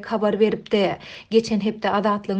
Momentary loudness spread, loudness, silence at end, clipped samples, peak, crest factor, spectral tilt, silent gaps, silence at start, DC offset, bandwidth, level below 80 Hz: 4 LU; -21 LUFS; 0 s; under 0.1%; -6 dBFS; 16 dB; -6 dB/octave; none; 0 s; under 0.1%; 8.8 kHz; -58 dBFS